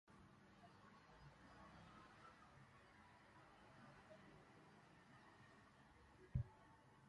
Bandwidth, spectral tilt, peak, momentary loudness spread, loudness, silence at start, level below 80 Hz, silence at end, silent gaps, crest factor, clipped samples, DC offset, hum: 11 kHz; -7 dB/octave; -32 dBFS; 15 LU; -62 LUFS; 0.05 s; -68 dBFS; 0 s; none; 28 dB; under 0.1%; under 0.1%; none